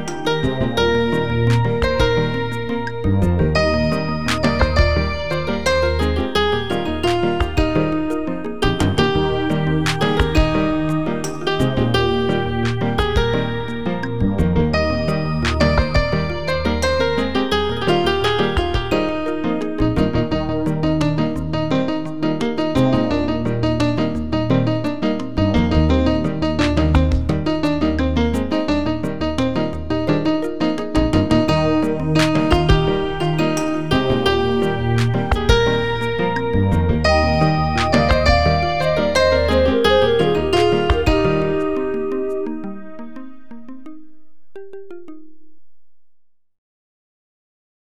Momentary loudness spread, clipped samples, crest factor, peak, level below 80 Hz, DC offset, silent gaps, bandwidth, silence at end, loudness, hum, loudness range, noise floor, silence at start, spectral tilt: 6 LU; under 0.1%; 18 dB; 0 dBFS; -28 dBFS; 3%; none; 14 kHz; 1.2 s; -18 LUFS; none; 4 LU; -55 dBFS; 0 s; -6.5 dB/octave